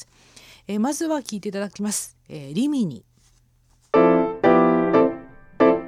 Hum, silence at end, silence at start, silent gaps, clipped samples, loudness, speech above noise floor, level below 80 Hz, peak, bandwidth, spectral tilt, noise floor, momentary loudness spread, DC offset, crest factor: none; 0 s; 0.7 s; none; under 0.1%; -21 LUFS; 34 dB; -56 dBFS; -4 dBFS; 16 kHz; -5.5 dB/octave; -60 dBFS; 16 LU; under 0.1%; 18 dB